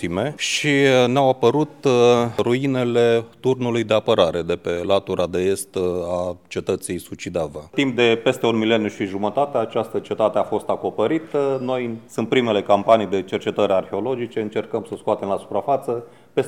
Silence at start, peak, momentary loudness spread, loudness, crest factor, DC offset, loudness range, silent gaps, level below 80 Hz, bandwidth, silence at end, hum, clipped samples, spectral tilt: 0 s; -2 dBFS; 10 LU; -20 LUFS; 20 dB; 0.2%; 5 LU; none; -56 dBFS; 14.5 kHz; 0 s; none; under 0.1%; -5 dB/octave